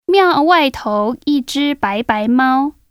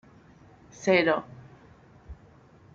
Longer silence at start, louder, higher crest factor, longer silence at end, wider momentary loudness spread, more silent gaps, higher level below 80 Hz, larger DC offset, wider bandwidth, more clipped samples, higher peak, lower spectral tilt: second, 0.1 s vs 0.8 s; first, -15 LUFS vs -25 LUFS; second, 14 dB vs 22 dB; second, 0.2 s vs 0.6 s; second, 7 LU vs 27 LU; neither; first, -48 dBFS vs -58 dBFS; neither; first, 15.5 kHz vs 7.6 kHz; neither; first, 0 dBFS vs -8 dBFS; about the same, -4.5 dB/octave vs -5 dB/octave